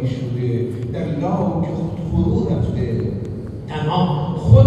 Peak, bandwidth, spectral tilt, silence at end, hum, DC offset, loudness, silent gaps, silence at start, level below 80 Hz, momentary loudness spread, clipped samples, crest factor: 0 dBFS; 7.6 kHz; -9.5 dB/octave; 0 s; none; under 0.1%; -21 LUFS; none; 0 s; -36 dBFS; 6 LU; under 0.1%; 18 dB